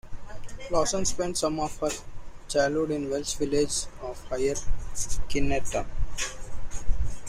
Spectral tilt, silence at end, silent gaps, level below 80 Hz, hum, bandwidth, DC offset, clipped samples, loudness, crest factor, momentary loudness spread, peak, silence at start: -3.5 dB/octave; 0 s; none; -34 dBFS; none; 14 kHz; under 0.1%; under 0.1%; -29 LUFS; 16 dB; 16 LU; -8 dBFS; 0.05 s